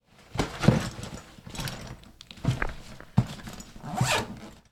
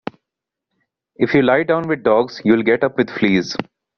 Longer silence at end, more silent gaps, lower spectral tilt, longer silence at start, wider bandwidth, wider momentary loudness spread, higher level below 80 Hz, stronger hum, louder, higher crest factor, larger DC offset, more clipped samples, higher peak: second, 0.1 s vs 0.35 s; neither; about the same, -5 dB/octave vs -4.5 dB/octave; second, 0.2 s vs 1.2 s; first, 15.5 kHz vs 6.8 kHz; first, 20 LU vs 9 LU; first, -44 dBFS vs -54 dBFS; neither; second, -30 LUFS vs -17 LUFS; first, 26 dB vs 16 dB; neither; neither; about the same, -4 dBFS vs -2 dBFS